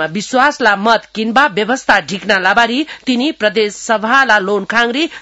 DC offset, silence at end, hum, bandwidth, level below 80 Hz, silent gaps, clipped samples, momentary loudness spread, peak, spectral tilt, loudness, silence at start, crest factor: 0.1%; 0 s; none; 12 kHz; -52 dBFS; none; 0.2%; 5 LU; 0 dBFS; -3.5 dB/octave; -13 LUFS; 0 s; 14 dB